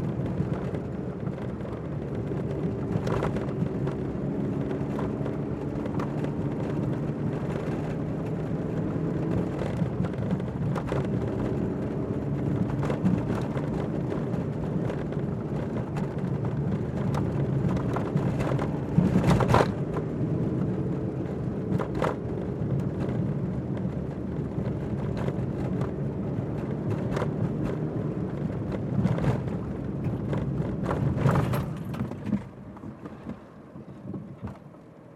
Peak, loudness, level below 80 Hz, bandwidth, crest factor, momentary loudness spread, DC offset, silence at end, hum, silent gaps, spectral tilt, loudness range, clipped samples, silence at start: -6 dBFS; -29 LUFS; -46 dBFS; 12.5 kHz; 22 dB; 7 LU; under 0.1%; 0 s; none; none; -8.5 dB/octave; 5 LU; under 0.1%; 0 s